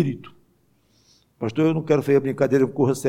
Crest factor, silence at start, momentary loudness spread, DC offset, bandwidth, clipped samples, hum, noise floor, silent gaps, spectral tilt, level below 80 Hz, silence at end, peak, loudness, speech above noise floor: 16 dB; 0 s; 10 LU; under 0.1%; 16 kHz; under 0.1%; none; -62 dBFS; none; -7.5 dB/octave; -66 dBFS; 0 s; -6 dBFS; -21 LUFS; 42 dB